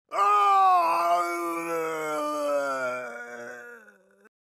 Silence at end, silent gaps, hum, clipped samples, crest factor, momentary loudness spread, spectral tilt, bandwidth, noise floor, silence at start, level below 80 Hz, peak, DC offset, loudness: 0.7 s; none; none; under 0.1%; 14 dB; 19 LU; -3 dB/octave; 15.5 kHz; -55 dBFS; 0.1 s; under -90 dBFS; -12 dBFS; under 0.1%; -24 LUFS